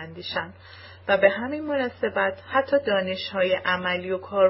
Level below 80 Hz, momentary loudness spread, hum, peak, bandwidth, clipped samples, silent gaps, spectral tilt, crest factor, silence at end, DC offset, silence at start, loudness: -60 dBFS; 11 LU; none; -4 dBFS; 5.8 kHz; under 0.1%; none; -8.5 dB/octave; 20 dB; 0 s; under 0.1%; 0 s; -24 LUFS